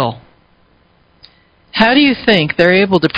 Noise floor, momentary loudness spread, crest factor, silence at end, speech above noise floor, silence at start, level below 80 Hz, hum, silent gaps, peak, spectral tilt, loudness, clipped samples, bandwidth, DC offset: -52 dBFS; 8 LU; 14 dB; 0 s; 42 dB; 0 s; -46 dBFS; none; none; 0 dBFS; -7 dB/octave; -11 LUFS; 0.1%; 8 kHz; under 0.1%